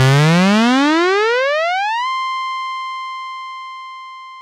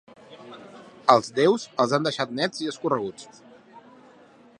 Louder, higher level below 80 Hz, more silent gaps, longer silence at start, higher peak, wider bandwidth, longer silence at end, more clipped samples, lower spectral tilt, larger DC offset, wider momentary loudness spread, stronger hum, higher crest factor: first, -15 LUFS vs -24 LUFS; first, -64 dBFS vs -72 dBFS; neither; second, 0 s vs 0.3 s; about the same, 0 dBFS vs 0 dBFS; first, 15 kHz vs 11 kHz; second, 0 s vs 0.8 s; neither; about the same, -5.5 dB/octave vs -4.5 dB/octave; neither; second, 19 LU vs 24 LU; neither; second, 16 dB vs 26 dB